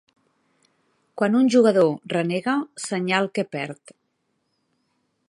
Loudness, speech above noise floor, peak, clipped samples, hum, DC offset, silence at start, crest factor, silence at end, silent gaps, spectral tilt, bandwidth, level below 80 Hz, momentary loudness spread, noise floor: -22 LUFS; 52 dB; -4 dBFS; under 0.1%; none; under 0.1%; 1.15 s; 20 dB; 1.55 s; none; -5.5 dB/octave; 11.5 kHz; -76 dBFS; 15 LU; -73 dBFS